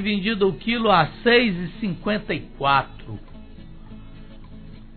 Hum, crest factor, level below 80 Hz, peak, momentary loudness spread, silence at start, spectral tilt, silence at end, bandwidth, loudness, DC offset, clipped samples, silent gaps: none; 18 dB; -42 dBFS; -4 dBFS; 17 LU; 0 s; -8.5 dB/octave; 0 s; 4.6 kHz; -21 LUFS; under 0.1%; under 0.1%; none